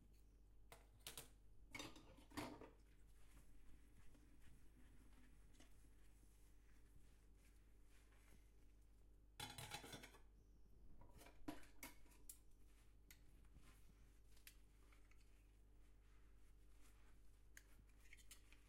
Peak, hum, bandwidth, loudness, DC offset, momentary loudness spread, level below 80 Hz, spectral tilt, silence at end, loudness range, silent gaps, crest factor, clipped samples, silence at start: -34 dBFS; none; 16 kHz; -60 LUFS; under 0.1%; 13 LU; -70 dBFS; -3 dB/octave; 0 s; 6 LU; none; 28 dB; under 0.1%; 0 s